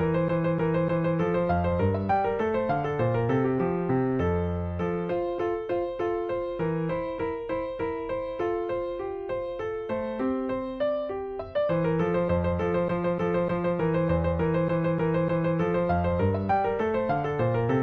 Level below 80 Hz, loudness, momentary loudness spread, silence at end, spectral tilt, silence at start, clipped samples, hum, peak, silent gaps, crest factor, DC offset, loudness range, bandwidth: -46 dBFS; -27 LUFS; 6 LU; 0 s; -10 dB/octave; 0 s; under 0.1%; none; -14 dBFS; none; 14 dB; under 0.1%; 5 LU; 6.4 kHz